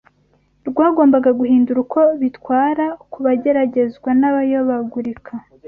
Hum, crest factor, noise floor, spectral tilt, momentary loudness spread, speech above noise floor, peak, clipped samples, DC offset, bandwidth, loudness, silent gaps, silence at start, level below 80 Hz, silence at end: none; 14 dB; -58 dBFS; -9.5 dB/octave; 12 LU; 43 dB; -2 dBFS; under 0.1%; under 0.1%; 3.3 kHz; -16 LUFS; none; 0.65 s; -58 dBFS; 0.25 s